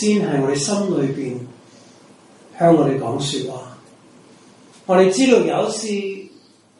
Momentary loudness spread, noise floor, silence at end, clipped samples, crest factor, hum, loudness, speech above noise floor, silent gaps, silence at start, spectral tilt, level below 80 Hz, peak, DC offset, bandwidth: 17 LU; -50 dBFS; 0.5 s; under 0.1%; 18 dB; none; -18 LUFS; 32 dB; none; 0 s; -5 dB/octave; -62 dBFS; -2 dBFS; under 0.1%; 11.5 kHz